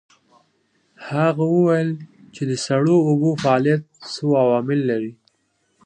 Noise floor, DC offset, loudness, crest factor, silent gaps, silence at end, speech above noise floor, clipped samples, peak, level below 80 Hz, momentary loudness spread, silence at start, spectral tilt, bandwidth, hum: -67 dBFS; under 0.1%; -19 LUFS; 18 dB; none; 0.75 s; 49 dB; under 0.1%; -4 dBFS; -64 dBFS; 12 LU; 1 s; -7 dB/octave; 10 kHz; none